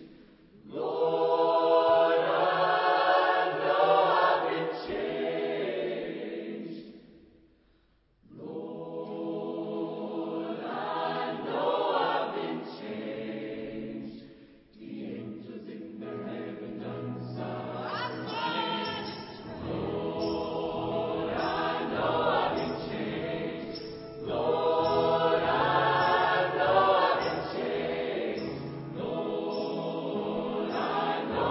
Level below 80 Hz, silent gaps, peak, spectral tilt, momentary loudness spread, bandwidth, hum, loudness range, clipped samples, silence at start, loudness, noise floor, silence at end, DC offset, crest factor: -60 dBFS; none; -10 dBFS; -9 dB/octave; 16 LU; 5.8 kHz; none; 14 LU; under 0.1%; 0 s; -29 LUFS; -67 dBFS; 0 s; under 0.1%; 18 dB